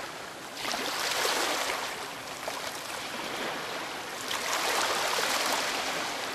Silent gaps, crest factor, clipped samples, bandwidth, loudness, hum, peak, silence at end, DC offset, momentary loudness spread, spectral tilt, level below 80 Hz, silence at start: none; 20 dB; under 0.1%; 14.5 kHz; -30 LUFS; none; -12 dBFS; 0 s; under 0.1%; 9 LU; -0.5 dB/octave; -68 dBFS; 0 s